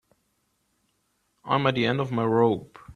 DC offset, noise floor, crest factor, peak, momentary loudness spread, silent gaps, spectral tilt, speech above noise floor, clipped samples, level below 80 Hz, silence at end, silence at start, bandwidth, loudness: under 0.1%; -72 dBFS; 20 dB; -6 dBFS; 5 LU; none; -7.5 dB/octave; 49 dB; under 0.1%; -60 dBFS; 0.05 s; 1.45 s; 10 kHz; -24 LUFS